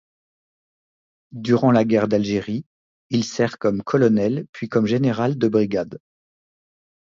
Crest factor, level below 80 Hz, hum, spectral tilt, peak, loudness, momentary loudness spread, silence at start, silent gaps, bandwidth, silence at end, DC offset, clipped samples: 18 dB; -58 dBFS; none; -7 dB/octave; -4 dBFS; -20 LUFS; 12 LU; 1.35 s; 2.66-3.10 s, 4.49-4.53 s; 7.6 kHz; 1.2 s; under 0.1%; under 0.1%